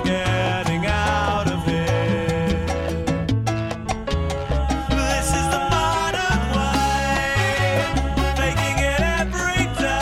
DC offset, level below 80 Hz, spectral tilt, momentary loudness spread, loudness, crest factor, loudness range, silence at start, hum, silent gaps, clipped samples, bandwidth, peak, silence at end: under 0.1%; -28 dBFS; -5 dB/octave; 4 LU; -21 LUFS; 12 dB; 3 LU; 0 s; none; none; under 0.1%; 15.5 kHz; -8 dBFS; 0 s